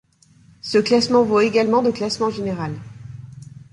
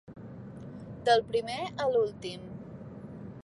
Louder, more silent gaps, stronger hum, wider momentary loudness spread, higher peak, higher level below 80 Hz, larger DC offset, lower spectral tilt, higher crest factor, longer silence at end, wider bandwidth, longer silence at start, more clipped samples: first, -19 LUFS vs -30 LUFS; neither; neither; first, 22 LU vs 19 LU; first, -4 dBFS vs -12 dBFS; first, -54 dBFS vs -62 dBFS; neither; about the same, -5.5 dB/octave vs -5 dB/octave; about the same, 16 dB vs 20 dB; first, 0.3 s vs 0.05 s; about the same, 11.5 kHz vs 11.5 kHz; first, 0.65 s vs 0.05 s; neither